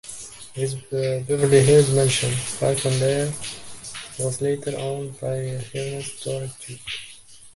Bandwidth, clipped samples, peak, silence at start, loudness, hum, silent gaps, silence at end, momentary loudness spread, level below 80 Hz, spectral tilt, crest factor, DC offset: 11.5 kHz; under 0.1%; -4 dBFS; 0.05 s; -22 LUFS; none; none; 0.05 s; 18 LU; -54 dBFS; -4.5 dB/octave; 20 dB; under 0.1%